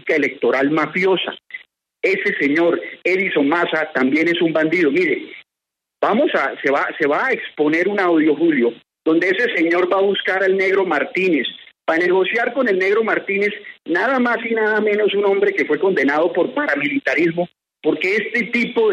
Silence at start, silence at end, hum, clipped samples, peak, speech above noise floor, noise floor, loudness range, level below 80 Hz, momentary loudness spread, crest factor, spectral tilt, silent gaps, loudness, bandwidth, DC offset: 0.05 s; 0 s; none; under 0.1%; -4 dBFS; 66 dB; -83 dBFS; 2 LU; -70 dBFS; 6 LU; 14 dB; -6 dB/octave; none; -17 LUFS; 8.6 kHz; under 0.1%